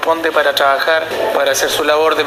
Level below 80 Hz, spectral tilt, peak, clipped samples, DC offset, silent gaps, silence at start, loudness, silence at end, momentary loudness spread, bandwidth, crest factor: -52 dBFS; -1.5 dB/octave; 0 dBFS; under 0.1%; under 0.1%; none; 0 s; -13 LUFS; 0 s; 3 LU; 15.5 kHz; 14 dB